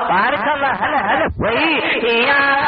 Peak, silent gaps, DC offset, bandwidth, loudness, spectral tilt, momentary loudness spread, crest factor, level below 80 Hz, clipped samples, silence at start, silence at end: -4 dBFS; none; under 0.1%; 5.6 kHz; -15 LUFS; -1.5 dB/octave; 4 LU; 12 dB; -40 dBFS; under 0.1%; 0 s; 0 s